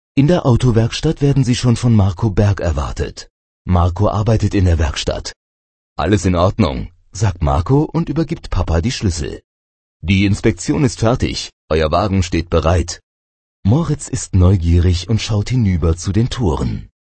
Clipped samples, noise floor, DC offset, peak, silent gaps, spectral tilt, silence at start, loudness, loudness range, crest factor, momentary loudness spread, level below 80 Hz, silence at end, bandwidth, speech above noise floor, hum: under 0.1%; under -90 dBFS; under 0.1%; 0 dBFS; 3.30-3.65 s, 5.36-5.96 s, 9.44-10.00 s, 11.53-11.68 s, 13.03-13.63 s; -6.5 dB/octave; 0.15 s; -16 LUFS; 2 LU; 16 dB; 10 LU; -26 dBFS; 0.2 s; 8.8 kHz; over 75 dB; none